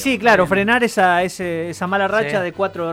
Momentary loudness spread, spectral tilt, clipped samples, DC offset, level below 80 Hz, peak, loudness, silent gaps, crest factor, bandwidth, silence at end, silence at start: 9 LU; -5 dB/octave; under 0.1%; under 0.1%; -50 dBFS; -4 dBFS; -17 LUFS; none; 14 dB; 16.5 kHz; 0 s; 0 s